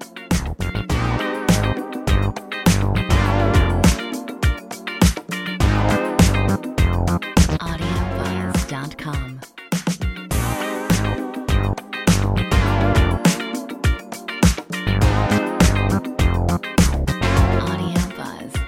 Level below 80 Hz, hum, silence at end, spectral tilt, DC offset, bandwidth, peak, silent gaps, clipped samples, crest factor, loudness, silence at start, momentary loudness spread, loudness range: -24 dBFS; none; 0 s; -5.5 dB/octave; under 0.1%; 16.5 kHz; 0 dBFS; none; under 0.1%; 18 dB; -20 LUFS; 0 s; 9 LU; 5 LU